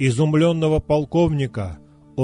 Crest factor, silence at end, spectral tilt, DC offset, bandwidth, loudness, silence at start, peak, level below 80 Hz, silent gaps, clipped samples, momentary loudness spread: 12 dB; 0 s; -7 dB/octave; under 0.1%; 10.5 kHz; -19 LUFS; 0 s; -6 dBFS; -38 dBFS; none; under 0.1%; 14 LU